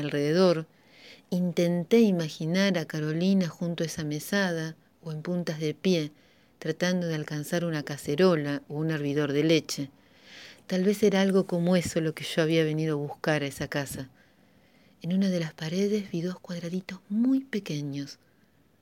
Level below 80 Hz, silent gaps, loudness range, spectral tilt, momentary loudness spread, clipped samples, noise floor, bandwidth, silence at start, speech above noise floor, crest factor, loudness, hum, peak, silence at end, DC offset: -66 dBFS; none; 5 LU; -6 dB/octave; 13 LU; under 0.1%; -64 dBFS; 17 kHz; 0 s; 37 dB; 18 dB; -28 LUFS; none; -10 dBFS; 0.65 s; under 0.1%